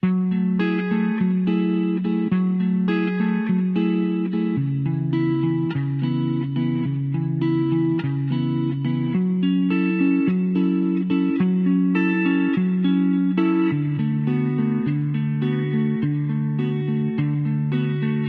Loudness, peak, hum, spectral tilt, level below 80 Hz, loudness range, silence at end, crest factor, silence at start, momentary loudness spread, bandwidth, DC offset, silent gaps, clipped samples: -21 LUFS; -8 dBFS; none; -11 dB/octave; -62 dBFS; 3 LU; 0 s; 14 dB; 0.05 s; 4 LU; 4.9 kHz; under 0.1%; none; under 0.1%